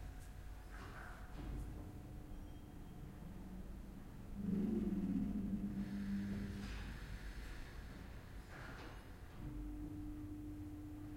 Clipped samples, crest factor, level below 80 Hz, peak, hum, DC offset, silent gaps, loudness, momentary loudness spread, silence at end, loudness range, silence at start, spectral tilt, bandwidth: under 0.1%; 16 dB; -52 dBFS; -30 dBFS; none; under 0.1%; none; -48 LUFS; 14 LU; 0 s; 10 LU; 0 s; -7 dB/octave; 16.5 kHz